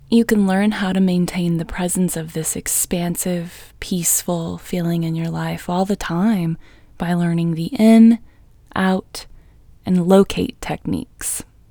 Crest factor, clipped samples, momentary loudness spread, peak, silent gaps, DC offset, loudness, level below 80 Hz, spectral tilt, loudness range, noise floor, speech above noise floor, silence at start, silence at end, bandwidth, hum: 18 dB; under 0.1%; 12 LU; 0 dBFS; none; under 0.1%; -19 LUFS; -44 dBFS; -5.5 dB/octave; 4 LU; -46 dBFS; 28 dB; 0.1 s; 0.25 s; over 20 kHz; none